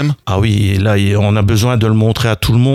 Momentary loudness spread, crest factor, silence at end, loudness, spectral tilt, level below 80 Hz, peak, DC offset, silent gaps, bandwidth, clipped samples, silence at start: 2 LU; 10 dB; 0 s; -13 LUFS; -6.5 dB/octave; -32 dBFS; -2 dBFS; under 0.1%; none; 14 kHz; under 0.1%; 0 s